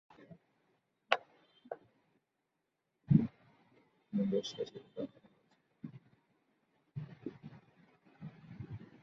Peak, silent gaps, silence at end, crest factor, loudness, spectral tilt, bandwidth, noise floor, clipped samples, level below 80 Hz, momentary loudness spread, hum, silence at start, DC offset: -6 dBFS; none; 0.15 s; 34 dB; -38 LUFS; -6 dB/octave; 7.2 kHz; -85 dBFS; under 0.1%; -70 dBFS; 23 LU; none; 0.2 s; under 0.1%